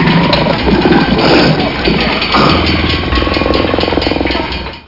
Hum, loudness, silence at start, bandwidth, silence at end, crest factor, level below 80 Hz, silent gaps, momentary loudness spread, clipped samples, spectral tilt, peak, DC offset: none; -10 LUFS; 0 s; 6 kHz; 0.05 s; 10 dB; -24 dBFS; none; 4 LU; under 0.1%; -6.5 dB/octave; 0 dBFS; 1%